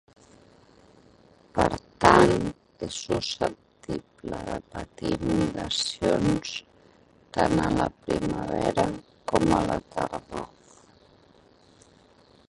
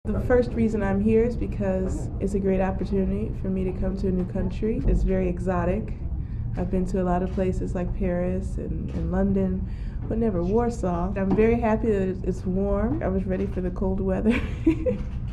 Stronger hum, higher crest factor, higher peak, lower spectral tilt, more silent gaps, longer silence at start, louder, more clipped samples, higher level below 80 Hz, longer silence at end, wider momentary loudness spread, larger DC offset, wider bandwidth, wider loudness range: neither; first, 26 dB vs 16 dB; first, -2 dBFS vs -8 dBFS; second, -5 dB/octave vs -9 dB/octave; neither; first, 1.55 s vs 0.05 s; about the same, -26 LUFS vs -25 LUFS; neither; second, -46 dBFS vs -30 dBFS; first, 2.05 s vs 0 s; first, 14 LU vs 8 LU; neither; first, 11.5 kHz vs 9.8 kHz; about the same, 5 LU vs 3 LU